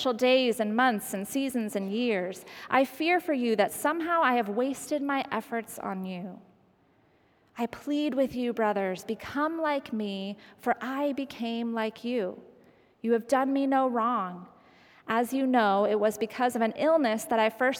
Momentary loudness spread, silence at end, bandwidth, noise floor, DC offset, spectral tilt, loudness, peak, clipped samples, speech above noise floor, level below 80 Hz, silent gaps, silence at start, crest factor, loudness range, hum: 11 LU; 0 s; 19 kHz; -65 dBFS; under 0.1%; -4.5 dB/octave; -28 LUFS; -8 dBFS; under 0.1%; 37 dB; -70 dBFS; none; 0 s; 20 dB; 6 LU; none